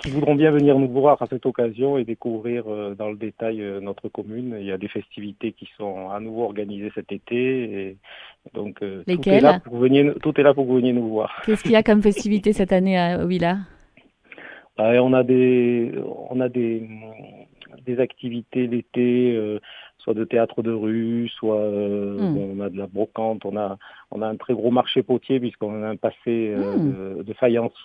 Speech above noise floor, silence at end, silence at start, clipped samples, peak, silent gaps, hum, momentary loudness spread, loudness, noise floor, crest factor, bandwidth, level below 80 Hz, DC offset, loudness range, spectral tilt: 34 dB; 0 s; 0 s; under 0.1%; 0 dBFS; none; none; 15 LU; -22 LUFS; -55 dBFS; 20 dB; 11 kHz; -52 dBFS; under 0.1%; 10 LU; -7.5 dB/octave